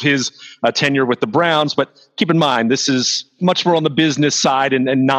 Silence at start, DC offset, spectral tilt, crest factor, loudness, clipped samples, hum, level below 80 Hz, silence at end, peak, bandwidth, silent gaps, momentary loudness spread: 0 s; under 0.1%; -4 dB/octave; 14 dB; -16 LUFS; under 0.1%; none; -66 dBFS; 0 s; -2 dBFS; 9.4 kHz; none; 5 LU